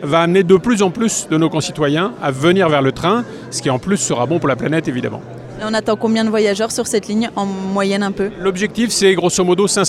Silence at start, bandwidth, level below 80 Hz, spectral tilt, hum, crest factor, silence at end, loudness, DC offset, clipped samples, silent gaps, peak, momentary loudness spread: 0 s; 15 kHz; -48 dBFS; -4.5 dB/octave; none; 16 dB; 0 s; -16 LUFS; under 0.1%; under 0.1%; none; 0 dBFS; 8 LU